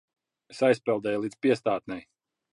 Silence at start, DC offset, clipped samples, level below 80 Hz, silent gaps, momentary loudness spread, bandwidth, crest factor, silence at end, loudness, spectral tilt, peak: 0.5 s; under 0.1%; under 0.1%; -70 dBFS; none; 15 LU; 11 kHz; 18 dB; 0.55 s; -27 LUFS; -6 dB/octave; -10 dBFS